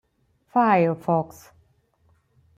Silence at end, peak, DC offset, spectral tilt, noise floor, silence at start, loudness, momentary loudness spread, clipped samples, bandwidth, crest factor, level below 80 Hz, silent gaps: 1.3 s; -6 dBFS; under 0.1%; -8 dB/octave; -66 dBFS; 0.55 s; -22 LUFS; 7 LU; under 0.1%; 15.5 kHz; 18 dB; -66 dBFS; none